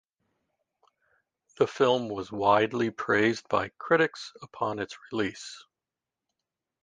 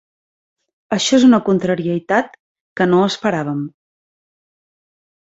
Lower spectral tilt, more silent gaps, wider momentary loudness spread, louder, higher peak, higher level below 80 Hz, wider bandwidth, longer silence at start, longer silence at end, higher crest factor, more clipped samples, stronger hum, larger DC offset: about the same, -5 dB/octave vs -5 dB/octave; second, none vs 2.40-2.55 s, 2.61-2.76 s; about the same, 17 LU vs 15 LU; second, -27 LUFS vs -16 LUFS; second, -10 dBFS vs -2 dBFS; second, -66 dBFS vs -58 dBFS; first, 9.6 kHz vs 8 kHz; first, 1.6 s vs 0.9 s; second, 1.25 s vs 1.65 s; about the same, 20 dB vs 18 dB; neither; neither; neither